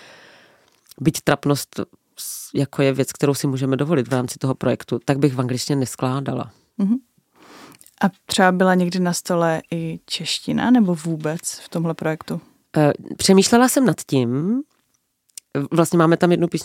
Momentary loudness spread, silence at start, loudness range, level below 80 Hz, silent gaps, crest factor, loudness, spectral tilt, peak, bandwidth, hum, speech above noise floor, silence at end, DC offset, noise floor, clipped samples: 12 LU; 1 s; 4 LU; -58 dBFS; none; 20 dB; -20 LUFS; -5.5 dB/octave; 0 dBFS; 17 kHz; none; 49 dB; 0 s; under 0.1%; -68 dBFS; under 0.1%